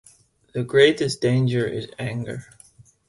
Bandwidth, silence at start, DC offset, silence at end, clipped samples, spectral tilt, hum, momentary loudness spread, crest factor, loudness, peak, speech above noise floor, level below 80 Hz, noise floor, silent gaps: 11.5 kHz; 0.55 s; under 0.1%; 0.65 s; under 0.1%; -6 dB/octave; none; 16 LU; 20 dB; -21 LUFS; -2 dBFS; 35 dB; -56 dBFS; -56 dBFS; none